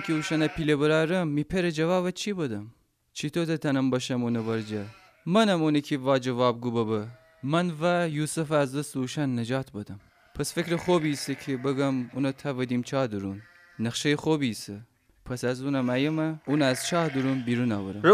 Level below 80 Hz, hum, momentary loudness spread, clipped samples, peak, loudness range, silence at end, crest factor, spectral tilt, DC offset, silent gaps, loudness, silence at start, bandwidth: -58 dBFS; none; 12 LU; under 0.1%; -6 dBFS; 3 LU; 0 s; 20 dB; -5.5 dB/octave; under 0.1%; none; -27 LUFS; 0 s; 15.5 kHz